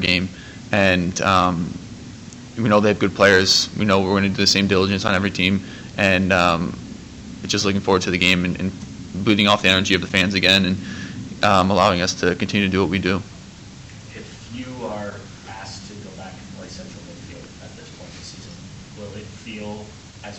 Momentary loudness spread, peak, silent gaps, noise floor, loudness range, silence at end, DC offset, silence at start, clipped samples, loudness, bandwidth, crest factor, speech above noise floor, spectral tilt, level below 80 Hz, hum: 22 LU; -2 dBFS; none; -39 dBFS; 19 LU; 0 s; under 0.1%; 0 s; under 0.1%; -18 LUFS; 16 kHz; 18 dB; 22 dB; -4 dB/octave; -48 dBFS; none